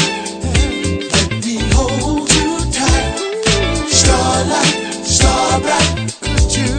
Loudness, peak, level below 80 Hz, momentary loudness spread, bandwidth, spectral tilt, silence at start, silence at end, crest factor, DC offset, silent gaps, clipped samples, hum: -14 LUFS; 0 dBFS; -22 dBFS; 7 LU; 9.4 kHz; -3.5 dB/octave; 0 s; 0 s; 14 dB; under 0.1%; none; under 0.1%; none